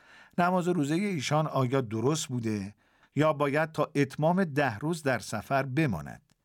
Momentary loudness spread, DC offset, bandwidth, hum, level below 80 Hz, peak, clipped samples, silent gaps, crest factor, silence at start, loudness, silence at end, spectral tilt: 8 LU; under 0.1%; 17 kHz; none; -64 dBFS; -12 dBFS; under 0.1%; none; 18 dB; 0.35 s; -29 LUFS; 0.3 s; -6 dB/octave